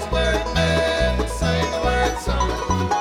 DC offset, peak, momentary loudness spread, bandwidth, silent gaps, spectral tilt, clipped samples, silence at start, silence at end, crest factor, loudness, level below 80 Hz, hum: under 0.1%; -8 dBFS; 4 LU; 15 kHz; none; -5 dB/octave; under 0.1%; 0 s; 0 s; 14 dB; -21 LUFS; -28 dBFS; none